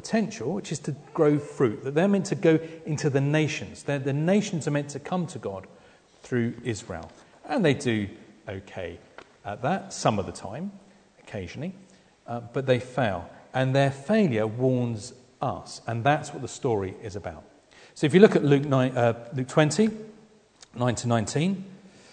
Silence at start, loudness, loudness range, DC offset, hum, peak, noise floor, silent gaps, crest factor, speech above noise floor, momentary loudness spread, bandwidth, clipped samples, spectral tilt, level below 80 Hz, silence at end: 0.05 s; -26 LUFS; 9 LU; under 0.1%; none; -2 dBFS; -55 dBFS; none; 24 dB; 30 dB; 15 LU; 9.4 kHz; under 0.1%; -6 dB/octave; -62 dBFS; 0.25 s